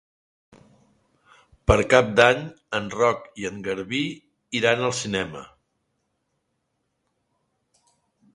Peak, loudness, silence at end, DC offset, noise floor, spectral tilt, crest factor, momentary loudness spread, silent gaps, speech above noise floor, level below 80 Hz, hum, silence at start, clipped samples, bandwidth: 0 dBFS; -22 LUFS; 2.9 s; under 0.1%; -75 dBFS; -4.5 dB/octave; 26 dB; 14 LU; none; 53 dB; -42 dBFS; none; 1.7 s; under 0.1%; 11.5 kHz